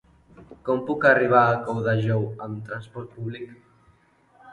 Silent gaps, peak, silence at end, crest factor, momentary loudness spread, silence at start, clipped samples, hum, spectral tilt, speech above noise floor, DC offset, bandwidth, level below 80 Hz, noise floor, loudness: none; -4 dBFS; 0 s; 20 dB; 18 LU; 0.4 s; under 0.1%; none; -8.5 dB/octave; 37 dB; under 0.1%; 9.4 kHz; -60 dBFS; -60 dBFS; -22 LUFS